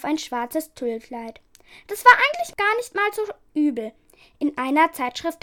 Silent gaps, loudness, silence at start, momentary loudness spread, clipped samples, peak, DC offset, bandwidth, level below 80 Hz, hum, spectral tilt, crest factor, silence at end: none; -21 LUFS; 0 s; 19 LU; under 0.1%; 0 dBFS; under 0.1%; 19 kHz; -62 dBFS; none; -2.5 dB/octave; 22 dB; 0.1 s